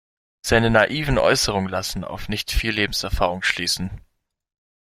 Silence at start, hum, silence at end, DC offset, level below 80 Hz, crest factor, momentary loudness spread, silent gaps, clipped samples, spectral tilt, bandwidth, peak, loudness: 0.45 s; none; 0.85 s; under 0.1%; -34 dBFS; 20 dB; 11 LU; none; under 0.1%; -4 dB/octave; 16 kHz; -2 dBFS; -21 LUFS